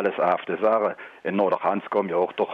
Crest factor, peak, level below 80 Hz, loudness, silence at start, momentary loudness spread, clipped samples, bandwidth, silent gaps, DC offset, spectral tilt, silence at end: 14 dB; -8 dBFS; -70 dBFS; -24 LUFS; 0 s; 6 LU; under 0.1%; 5.4 kHz; none; under 0.1%; -8 dB/octave; 0 s